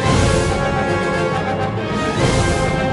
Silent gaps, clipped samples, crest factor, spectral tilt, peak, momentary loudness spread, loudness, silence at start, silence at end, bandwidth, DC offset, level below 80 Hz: none; under 0.1%; 14 dB; -5.5 dB/octave; -4 dBFS; 5 LU; -18 LUFS; 0 s; 0 s; 11.5 kHz; under 0.1%; -28 dBFS